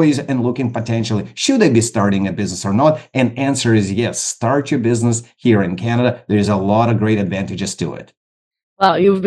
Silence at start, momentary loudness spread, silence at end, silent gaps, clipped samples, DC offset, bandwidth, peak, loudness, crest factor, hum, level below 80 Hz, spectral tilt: 0 s; 8 LU; 0 s; 8.17-8.51 s, 8.63-8.76 s; under 0.1%; under 0.1%; 12.5 kHz; 0 dBFS; -16 LUFS; 16 dB; none; -56 dBFS; -5.5 dB/octave